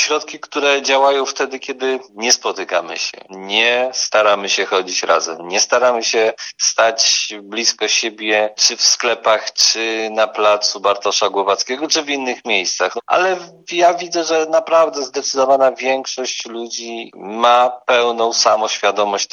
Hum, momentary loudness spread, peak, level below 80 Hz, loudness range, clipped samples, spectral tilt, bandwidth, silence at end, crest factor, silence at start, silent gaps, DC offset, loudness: none; 9 LU; 0 dBFS; -72 dBFS; 3 LU; under 0.1%; 0 dB/octave; 13 kHz; 0.1 s; 16 dB; 0 s; none; under 0.1%; -16 LUFS